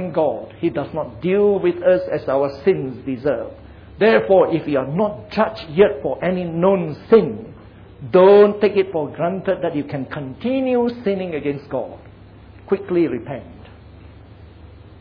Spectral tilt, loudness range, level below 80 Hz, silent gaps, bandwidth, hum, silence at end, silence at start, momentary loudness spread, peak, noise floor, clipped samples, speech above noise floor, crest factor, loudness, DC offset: -9.5 dB/octave; 8 LU; -48 dBFS; none; 5.2 kHz; none; 0.1 s; 0 s; 13 LU; -2 dBFS; -42 dBFS; under 0.1%; 24 dB; 18 dB; -18 LUFS; under 0.1%